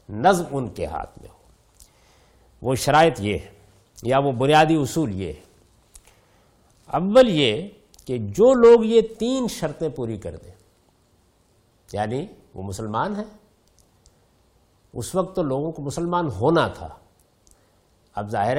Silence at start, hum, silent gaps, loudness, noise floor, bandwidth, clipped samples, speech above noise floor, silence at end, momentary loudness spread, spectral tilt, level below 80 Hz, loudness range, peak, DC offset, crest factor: 0.1 s; none; none; -21 LUFS; -61 dBFS; 16 kHz; under 0.1%; 40 dB; 0 s; 19 LU; -5.5 dB/octave; -50 dBFS; 13 LU; -4 dBFS; under 0.1%; 20 dB